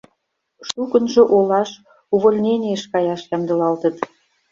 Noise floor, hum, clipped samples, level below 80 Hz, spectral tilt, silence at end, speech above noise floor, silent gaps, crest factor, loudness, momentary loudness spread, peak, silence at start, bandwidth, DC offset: -72 dBFS; none; under 0.1%; -62 dBFS; -6 dB/octave; 0.45 s; 54 dB; none; 16 dB; -18 LUFS; 14 LU; -2 dBFS; 0.6 s; 7.8 kHz; under 0.1%